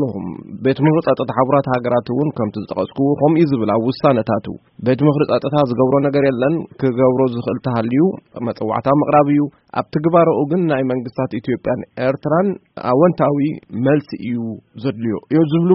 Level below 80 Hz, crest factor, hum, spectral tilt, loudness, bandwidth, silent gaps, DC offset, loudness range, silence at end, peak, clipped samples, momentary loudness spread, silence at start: -54 dBFS; 16 dB; none; -7.5 dB/octave; -17 LUFS; 5.8 kHz; none; under 0.1%; 2 LU; 0 s; 0 dBFS; under 0.1%; 9 LU; 0 s